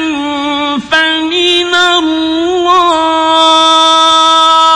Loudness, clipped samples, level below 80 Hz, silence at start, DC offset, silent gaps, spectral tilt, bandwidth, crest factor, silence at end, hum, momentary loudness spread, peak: -8 LUFS; 0.2%; -48 dBFS; 0 s; under 0.1%; none; -1.5 dB/octave; 11.5 kHz; 8 dB; 0 s; none; 8 LU; 0 dBFS